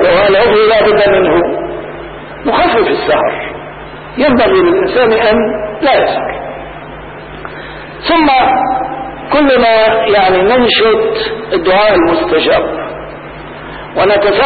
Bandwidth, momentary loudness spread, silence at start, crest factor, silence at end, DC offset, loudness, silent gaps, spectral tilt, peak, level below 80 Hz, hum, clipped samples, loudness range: 4.8 kHz; 18 LU; 0 s; 10 dB; 0 s; under 0.1%; -10 LUFS; none; -10.5 dB/octave; -2 dBFS; -36 dBFS; none; under 0.1%; 5 LU